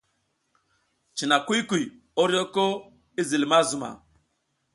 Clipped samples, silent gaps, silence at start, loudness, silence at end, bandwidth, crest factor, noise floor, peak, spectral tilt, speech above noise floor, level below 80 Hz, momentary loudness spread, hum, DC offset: under 0.1%; none; 1.15 s; -24 LUFS; 0.8 s; 11.5 kHz; 20 dB; -74 dBFS; -6 dBFS; -3.5 dB/octave; 50 dB; -68 dBFS; 14 LU; none; under 0.1%